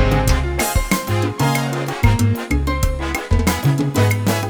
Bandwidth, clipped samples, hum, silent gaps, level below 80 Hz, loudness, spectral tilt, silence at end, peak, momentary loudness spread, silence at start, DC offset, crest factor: over 20 kHz; under 0.1%; none; none; -24 dBFS; -18 LUFS; -5.5 dB/octave; 0 s; -2 dBFS; 4 LU; 0 s; under 0.1%; 16 dB